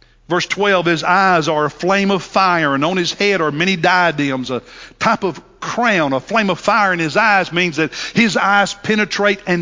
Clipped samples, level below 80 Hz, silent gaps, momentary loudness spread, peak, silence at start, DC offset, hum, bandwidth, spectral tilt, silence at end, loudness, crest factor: under 0.1%; -52 dBFS; none; 7 LU; 0 dBFS; 0.3 s; under 0.1%; none; 7.6 kHz; -4.5 dB/octave; 0 s; -15 LUFS; 16 dB